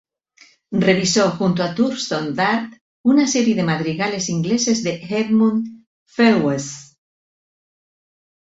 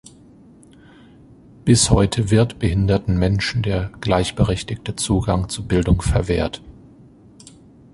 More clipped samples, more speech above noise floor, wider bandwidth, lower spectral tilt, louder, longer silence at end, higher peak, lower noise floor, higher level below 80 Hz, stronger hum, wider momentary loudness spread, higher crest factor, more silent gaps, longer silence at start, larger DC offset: neither; first, 35 dB vs 29 dB; second, 8 kHz vs 11.5 kHz; about the same, -4.5 dB/octave vs -5.5 dB/octave; about the same, -18 LUFS vs -19 LUFS; first, 1.65 s vs 1.25 s; about the same, -2 dBFS vs -2 dBFS; first, -53 dBFS vs -47 dBFS; second, -58 dBFS vs -32 dBFS; neither; about the same, 10 LU vs 9 LU; about the same, 18 dB vs 18 dB; first, 2.81-3.04 s, 5.87-6.06 s vs none; second, 0.7 s vs 1.65 s; neither